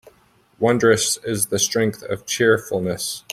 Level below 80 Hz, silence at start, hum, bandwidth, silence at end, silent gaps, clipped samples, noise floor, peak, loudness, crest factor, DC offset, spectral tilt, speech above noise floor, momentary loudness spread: -58 dBFS; 0.6 s; none; 16 kHz; 0 s; none; under 0.1%; -57 dBFS; -2 dBFS; -20 LUFS; 20 dB; under 0.1%; -3.5 dB/octave; 37 dB; 9 LU